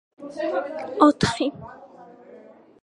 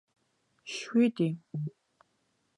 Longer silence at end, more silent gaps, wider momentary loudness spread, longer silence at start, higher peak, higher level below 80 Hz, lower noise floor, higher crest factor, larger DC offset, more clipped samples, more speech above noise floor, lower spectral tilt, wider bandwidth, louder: second, 0.45 s vs 0.9 s; neither; first, 22 LU vs 14 LU; second, 0.2 s vs 0.65 s; first, -2 dBFS vs -14 dBFS; first, -52 dBFS vs -82 dBFS; second, -48 dBFS vs -75 dBFS; first, 24 dB vs 18 dB; neither; neither; second, 26 dB vs 46 dB; about the same, -5.5 dB/octave vs -6.5 dB/octave; about the same, 11 kHz vs 10.5 kHz; first, -22 LUFS vs -31 LUFS